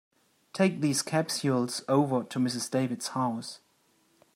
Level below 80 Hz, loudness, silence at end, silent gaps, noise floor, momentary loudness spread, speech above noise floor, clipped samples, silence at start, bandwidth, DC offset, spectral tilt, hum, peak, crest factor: -76 dBFS; -29 LUFS; 0.8 s; none; -68 dBFS; 10 LU; 39 dB; under 0.1%; 0.55 s; 16 kHz; under 0.1%; -5 dB/octave; none; -12 dBFS; 18 dB